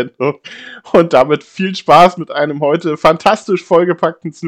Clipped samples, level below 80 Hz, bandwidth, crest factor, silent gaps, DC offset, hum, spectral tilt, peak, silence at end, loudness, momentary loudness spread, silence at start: 1%; -48 dBFS; 14 kHz; 12 dB; none; under 0.1%; none; -6 dB/octave; 0 dBFS; 0 s; -12 LUFS; 11 LU; 0 s